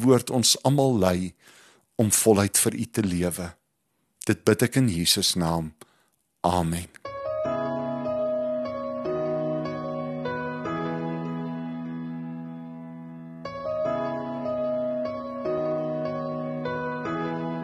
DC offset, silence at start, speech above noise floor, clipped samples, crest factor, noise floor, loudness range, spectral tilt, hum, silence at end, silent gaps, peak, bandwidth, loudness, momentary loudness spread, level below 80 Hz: under 0.1%; 0 s; 51 dB; under 0.1%; 20 dB; -74 dBFS; 9 LU; -4.5 dB/octave; none; 0 s; none; -6 dBFS; 13 kHz; -26 LUFS; 15 LU; -54 dBFS